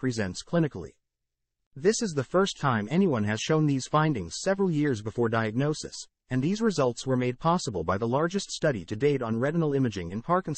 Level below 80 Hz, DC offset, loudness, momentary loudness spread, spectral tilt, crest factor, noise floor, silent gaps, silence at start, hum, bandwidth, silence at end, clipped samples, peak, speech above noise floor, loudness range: -58 dBFS; under 0.1%; -27 LUFS; 5 LU; -5.5 dB/octave; 18 dB; -84 dBFS; 1.67-1.71 s; 0 s; none; 8.8 kHz; 0 s; under 0.1%; -10 dBFS; 57 dB; 2 LU